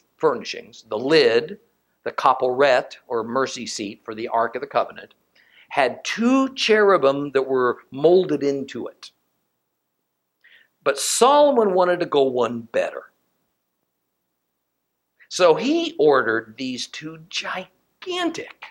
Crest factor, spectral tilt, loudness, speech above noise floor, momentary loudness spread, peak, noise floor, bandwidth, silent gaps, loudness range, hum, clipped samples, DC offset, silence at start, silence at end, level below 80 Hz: 20 dB; -3.5 dB/octave; -20 LUFS; 56 dB; 15 LU; -2 dBFS; -76 dBFS; 14 kHz; none; 6 LU; none; under 0.1%; under 0.1%; 0.2 s; 0 s; -72 dBFS